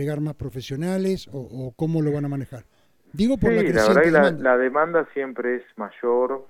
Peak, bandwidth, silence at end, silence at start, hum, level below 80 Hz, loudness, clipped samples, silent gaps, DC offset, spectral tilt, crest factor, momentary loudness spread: -4 dBFS; 16.5 kHz; 0.05 s; 0 s; none; -46 dBFS; -22 LUFS; under 0.1%; none; under 0.1%; -7 dB/octave; 18 dB; 16 LU